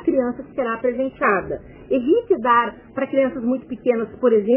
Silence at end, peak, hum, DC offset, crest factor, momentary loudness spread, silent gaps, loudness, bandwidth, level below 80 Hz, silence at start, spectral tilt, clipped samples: 0 s; -6 dBFS; none; under 0.1%; 14 dB; 8 LU; none; -21 LUFS; 3.4 kHz; -52 dBFS; 0 s; -4.5 dB/octave; under 0.1%